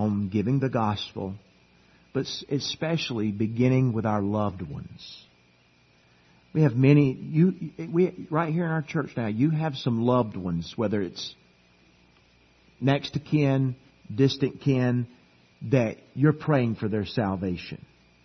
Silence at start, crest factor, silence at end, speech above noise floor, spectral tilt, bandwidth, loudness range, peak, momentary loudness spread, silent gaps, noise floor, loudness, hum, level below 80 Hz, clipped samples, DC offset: 0 s; 20 dB; 0.5 s; 36 dB; -7.5 dB/octave; 6.4 kHz; 5 LU; -6 dBFS; 14 LU; none; -61 dBFS; -26 LUFS; none; -60 dBFS; under 0.1%; under 0.1%